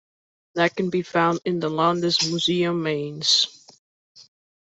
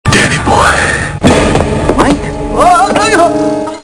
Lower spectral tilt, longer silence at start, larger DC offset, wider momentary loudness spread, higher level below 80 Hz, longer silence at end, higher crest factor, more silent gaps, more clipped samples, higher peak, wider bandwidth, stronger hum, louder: about the same, -4 dB/octave vs -4.5 dB/octave; first, 0.55 s vs 0.05 s; neither; about the same, 7 LU vs 5 LU; second, -66 dBFS vs -24 dBFS; first, 0.4 s vs 0 s; first, 20 dB vs 8 dB; first, 3.79-4.15 s vs none; second, under 0.1% vs 2%; second, -4 dBFS vs 0 dBFS; second, 8.2 kHz vs 12 kHz; neither; second, -22 LUFS vs -9 LUFS